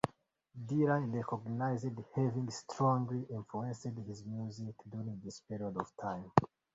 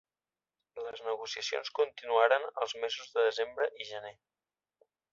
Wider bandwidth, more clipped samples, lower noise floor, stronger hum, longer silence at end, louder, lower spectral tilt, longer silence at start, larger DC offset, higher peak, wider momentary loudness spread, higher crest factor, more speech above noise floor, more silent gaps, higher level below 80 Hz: about the same, 8 kHz vs 7.6 kHz; neither; second, -67 dBFS vs under -90 dBFS; neither; second, 0.3 s vs 1 s; second, -37 LUFS vs -33 LUFS; first, -7.5 dB/octave vs 0 dB/octave; second, 0.05 s vs 0.75 s; neither; first, -6 dBFS vs -10 dBFS; second, 13 LU vs 16 LU; first, 30 dB vs 24 dB; second, 31 dB vs over 57 dB; neither; first, -68 dBFS vs -80 dBFS